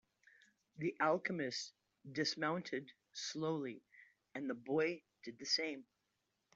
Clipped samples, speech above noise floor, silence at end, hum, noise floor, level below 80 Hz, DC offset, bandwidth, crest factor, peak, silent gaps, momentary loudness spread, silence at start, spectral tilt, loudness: under 0.1%; 45 dB; 0.75 s; none; -86 dBFS; -86 dBFS; under 0.1%; 8 kHz; 22 dB; -22 dBFS; none; 15 LU; 0.75 s; -4 dB/octave; -40 LUFS